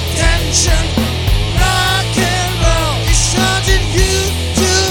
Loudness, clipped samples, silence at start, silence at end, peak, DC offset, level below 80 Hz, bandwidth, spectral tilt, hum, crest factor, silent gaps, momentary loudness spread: -13 LUFS; under 0.1%; 0 s; 0 s; 0 dBFS; under 0.1%; -18 dBFS; 18.5 kHz; -3.5 dB/octave; none; 12 dB; none; 3 LU